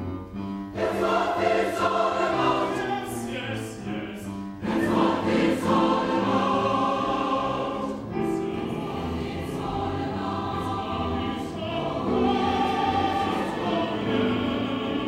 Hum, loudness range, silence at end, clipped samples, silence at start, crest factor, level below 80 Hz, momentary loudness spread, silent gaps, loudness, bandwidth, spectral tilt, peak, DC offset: none; 5 LU; 0 s; under 0.1%; 0 s; 18 dB; -48 dBFS; 9 LU; none; -26 LUFS; 16 kHz; -6 dB/octave; -8 dBFS; under 0.1%